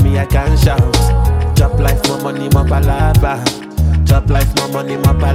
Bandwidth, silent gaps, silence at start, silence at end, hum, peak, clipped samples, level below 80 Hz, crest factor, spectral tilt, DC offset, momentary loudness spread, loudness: 16.5 kHz; none; 0 s; 0 s; none; 0 dBFS; under 0.1%; -16 dBFS; 12 dB; -6 dB/octave; under 0.1%; 5 LU; -13 LUFS